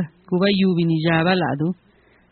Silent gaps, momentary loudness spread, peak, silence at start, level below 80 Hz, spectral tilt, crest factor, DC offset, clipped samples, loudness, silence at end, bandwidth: none; 8 LU; -4 dBFS; 0 s; -56 dBFS; -5 dB/octave; 16 dB; under 0.1%; under 0.1%; -20 LUFS; 0.6 s; 4.5 kHz